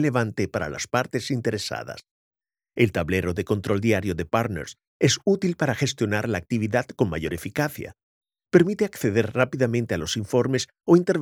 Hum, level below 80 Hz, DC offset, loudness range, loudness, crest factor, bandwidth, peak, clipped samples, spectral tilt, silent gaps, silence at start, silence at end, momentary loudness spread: none; -52 dBFS; under 0.1%; 3 LU; -24 LUFS; 20 dB; 17 kHz; -4 dBFS; under 0.1%; -5.5 dB/octave; 2.11-2.31 s, 4.87-5.00 s, 8.03-8.21 s; 0 s; 0 s; 9 LU